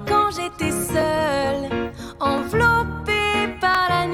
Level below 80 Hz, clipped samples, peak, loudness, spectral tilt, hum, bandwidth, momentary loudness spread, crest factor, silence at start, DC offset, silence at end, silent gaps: -40 dBFS; under 0.1%; -6 dBFS; -21 LUFS; -4.5 dB/octave; none; 17 kHz; 7 LU; 16 dB; 0 s; under 0.1%; 0 s; none